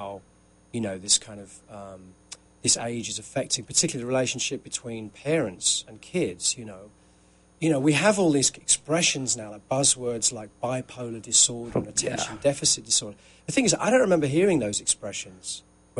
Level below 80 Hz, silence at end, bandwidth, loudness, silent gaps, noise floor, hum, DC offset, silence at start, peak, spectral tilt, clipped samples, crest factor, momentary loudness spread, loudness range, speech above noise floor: -58 dBFS; 0 s; 11.5 kHz; -24 LUFS; none; -58 dBFS; none; under 0.1%; 0 s; -8 dBFS; -3 dB/octave; under 0.1%; 20 dB; 17 LU; 5 LU; 32 dB